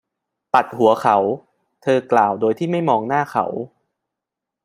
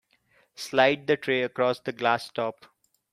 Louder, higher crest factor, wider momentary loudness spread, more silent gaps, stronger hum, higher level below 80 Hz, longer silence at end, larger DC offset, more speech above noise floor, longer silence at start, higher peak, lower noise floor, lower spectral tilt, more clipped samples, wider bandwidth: first, -18 LUFS vs -26 LUFS; about the same, 18 dB vs 22 dB; about the same, 11 LU vs 10 LU; neither; neither; about the same, -66 dBFS vs -70 dBFS; first, 1 s vs 0.6 s; neither; first, 67 dB vs 40 dB; about the same, 0.55 s vs 0.6 s; first, -2 dBFS vs -6 dBFS; first, -84 dBFS vs -65 dBFS; first, -6.5 dB/octave vs -4.5 dB/octave; neither; about the same, 15.5 kHz vs 15 kHz